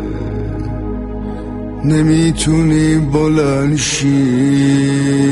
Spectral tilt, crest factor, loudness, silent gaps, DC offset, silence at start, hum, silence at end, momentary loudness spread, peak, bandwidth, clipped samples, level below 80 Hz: -6 dB/octave; 12 dB; -14 LUFS; none; under 0.1%; 0 s; none; 0 s; 11 LU; -2 dBFS; 11.5 kHz; under 0.1%; -28 dBFS